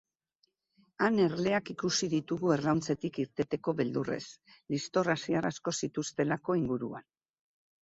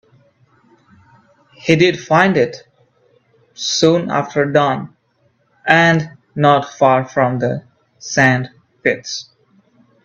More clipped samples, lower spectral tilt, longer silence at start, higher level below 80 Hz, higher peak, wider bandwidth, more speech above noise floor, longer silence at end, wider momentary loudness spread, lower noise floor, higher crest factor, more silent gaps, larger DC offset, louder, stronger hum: neither; about the same, -5 dB/octave vs -5 dB/octave; second, 1 s vs 1.65 s; second, -66 dBFS vs -56 dBFS; second, -12 dBFS vs 0 dBFS; about the same, 8 kHz vs 8.2 kHz; about the same, 45 dB vs 46 dB; about the same, 0.8 s vs 0.85 s; second, 8 LU vs 14 LU; first, -77 dBFS vs -60 dBFS; about the same, 20 dB vs 18 dB; neither; neither; second, -32 LUFS vs -15 LUFS; neither